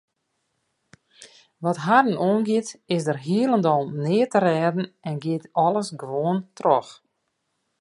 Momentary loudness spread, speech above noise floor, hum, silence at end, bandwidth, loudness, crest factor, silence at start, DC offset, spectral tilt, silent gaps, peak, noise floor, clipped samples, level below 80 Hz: 9 LU; 53 dB; none; 0.85 s; 11.5 kHz; -23 LUFS; 20 dB; 1.2 s; under 0.1%; -6.5 dB/octave; none; -4 dBFS; -75 dBFS; under 0.1%; -72 dBFS